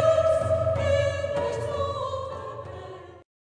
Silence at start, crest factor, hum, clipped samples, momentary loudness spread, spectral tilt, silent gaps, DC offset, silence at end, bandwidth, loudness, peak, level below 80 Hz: 0 s; 16 dB; none; under 0.1%; 17 LU; -6 dB/octave; none; under 0.1%; 0.3 s; 10.5 kHz; -26 LUFS; -10 dBFS; -48 dBFS